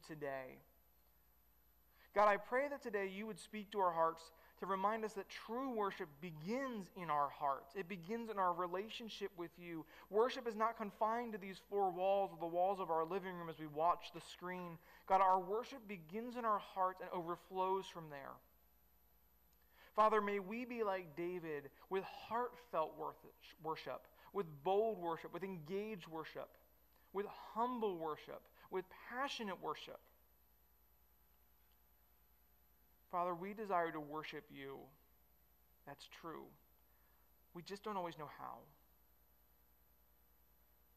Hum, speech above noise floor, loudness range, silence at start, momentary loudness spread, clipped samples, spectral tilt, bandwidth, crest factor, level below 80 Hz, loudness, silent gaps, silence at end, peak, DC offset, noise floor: 50 Hz at -75 dBFS; 31 dB; 12 LU; 0.05 s; 15 LU; under 0.1%; -5.5 dB/octave; 15.5 kHz; 20 dB; -76 dBFS; -42 LUFS; none; 2.3 s; -24 dBFS; under 0.1%; -74 dBFS